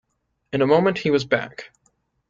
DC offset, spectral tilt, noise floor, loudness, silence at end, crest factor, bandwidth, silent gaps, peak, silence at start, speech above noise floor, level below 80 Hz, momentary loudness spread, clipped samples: under 0.1%; -6.5 dB/octave; -67 dBFS; -20 LUFS; 0.65 s; 18 dB; 7.6 kHz; none; -4 dBFS; 0.55 s; 47 dB; -60 dBFS; 16 LU; under 0.1%